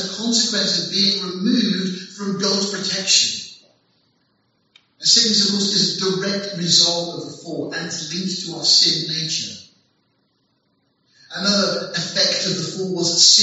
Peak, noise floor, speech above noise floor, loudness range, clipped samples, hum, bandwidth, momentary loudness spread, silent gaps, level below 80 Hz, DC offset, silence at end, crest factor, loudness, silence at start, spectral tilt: 0 dBFS; -66 dBFS; 47 dB; 5 LU; under 0.1%; none; 8.2 kHz; 14 LU; none; -70 dBFS; under 0.1%; 0 s; 20 dB; -17 LUFS; 0 s; -2 dB/octave